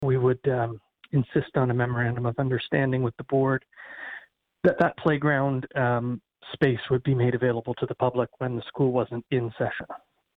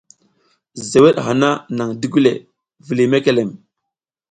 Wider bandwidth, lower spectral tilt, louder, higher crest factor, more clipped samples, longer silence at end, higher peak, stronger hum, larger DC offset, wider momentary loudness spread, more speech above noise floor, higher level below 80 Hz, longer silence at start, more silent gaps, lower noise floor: second, 4.6 kHz vs 10.5 kHz; first, -10 dB/octave vs -5.5 dB/octave; second, -26 LUFS vs -16 LUFS; about the same, 16 dB vs 18 dB; neither; second, 0.4 s vs 0.75 s; second, -10 dBFS vs 0 dBFS; neither; neither; about the same, 14 LU vs 15 LU; second, 23 dB vs 66 dB; about the same, -56 dBFS vs -56 dBFS; second, 0 s vs 0.75 s; neither; second, -49 dBFS vs -81 dBFS